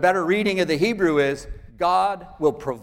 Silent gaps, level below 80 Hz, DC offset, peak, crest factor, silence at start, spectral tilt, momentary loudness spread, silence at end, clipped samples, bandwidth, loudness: none; -46 dBFS; under 0.1%; -6 dBFS; 16 dB; 0 s; -5.5 dB/octave; 6 LU; 0 s; under 0.1%; 16.5 kHz; -21 LUFS